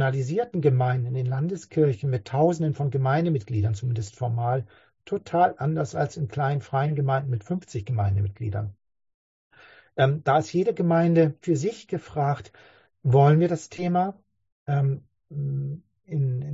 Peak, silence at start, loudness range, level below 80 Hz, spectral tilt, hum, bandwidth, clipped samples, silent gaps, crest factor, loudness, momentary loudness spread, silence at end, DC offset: -6 dBFS; 0 s; 4 LU; -50 dBFS; -8 dB/octave; none; 8 kHz; under 0.1%; 9.14-9.51 s, 14.52-14.66 s; 18 dB; -25 LUFS; 11 LU; 0 s; under 0.1%